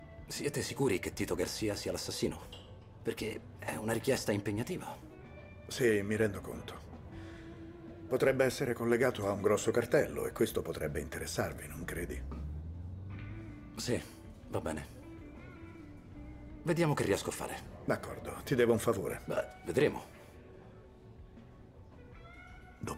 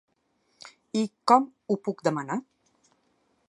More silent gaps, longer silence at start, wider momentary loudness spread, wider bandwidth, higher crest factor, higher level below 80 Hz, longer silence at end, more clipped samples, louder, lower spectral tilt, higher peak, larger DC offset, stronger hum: neither; second, 0 s vs 0.65 s; first, 22 LU vs 11 LU; first, 16 kHz vs 11.5 kHz; about the same, 20 dB vs 24 dB; first, -54 dBFS vs -80 dBFS; second, 0 s vs 1.1 s; neither; second, -35 LUFS vs -27 LUFS; about the same, -5 dB/octave vs -5.5 dB/octave; second, -16 dBFS vs -6 dBFS; neither; neither